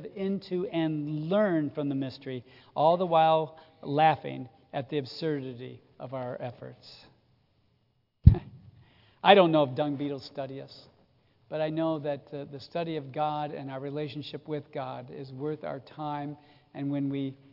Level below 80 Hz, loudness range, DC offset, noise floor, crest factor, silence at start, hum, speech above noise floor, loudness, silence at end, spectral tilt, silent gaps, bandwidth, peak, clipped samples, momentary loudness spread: -42 dBFS; 11 LU; under 0.1%; -72 dBFS; 28 dB; 0 s; none; 42 dB; -29 LUFS; 0.2 s; -9 dB/octave; none; 5.8 kHz; -2 dBFS; under 0.1%; 18 LU